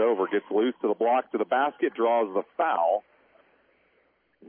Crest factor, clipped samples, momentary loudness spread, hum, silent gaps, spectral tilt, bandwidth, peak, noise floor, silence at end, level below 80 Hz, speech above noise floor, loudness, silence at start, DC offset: 14 dB; under 0.1%; 3 LU; none; none; -8.5 dB/octave; 3.6 kHz; -12 dBFS; -68 dBFS; 1.5 s; -86 dBFS; 42 dB; -26 LUFS; 0 s; under 0.1%